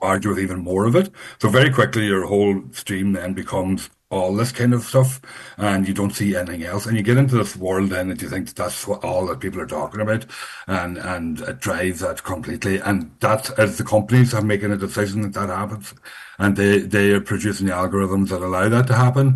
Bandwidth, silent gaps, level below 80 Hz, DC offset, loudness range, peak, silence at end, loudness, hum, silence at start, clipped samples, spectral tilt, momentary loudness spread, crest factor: 12.5 kHz; none; -50 dBFS; under 0.1%; 6 LU; -2 dBFS; 0 s; -20 LUFS; none; 0 s; under 0.1%; -6 dB/octave; 11 LU; 18 dB